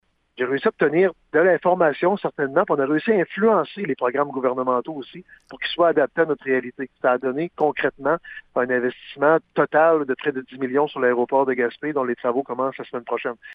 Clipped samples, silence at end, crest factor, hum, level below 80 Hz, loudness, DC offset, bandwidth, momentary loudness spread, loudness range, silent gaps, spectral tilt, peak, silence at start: under 0.1%; 0 s; 18 dB; none; -66 dBFS; -21 LUFS; under 0.1%; 5 kHz; 9 LU; 3 LU; none; -9 dB/octave; -4 dBFS; 0.4 s